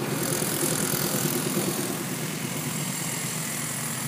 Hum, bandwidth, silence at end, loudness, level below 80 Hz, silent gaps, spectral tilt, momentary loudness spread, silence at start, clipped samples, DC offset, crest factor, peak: none; 16 kHz; 0 s; -27 LUFS; -64 dBFS; none; -3.5 dB/octave; 5 LU; 0 s; under 0.1%; under 0.1%; 16 dB; -12 dBFS